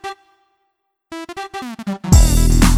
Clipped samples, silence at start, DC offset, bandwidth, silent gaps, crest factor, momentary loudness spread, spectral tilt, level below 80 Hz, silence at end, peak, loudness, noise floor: under 0.1%; 0.05 s; under 0.1%; 16 kHz; none; 16 dB; 20 LU; -5 dB/octave; -18 dBFS; 0 s; 0 dBFS; -16 LUFS; -70 dBFS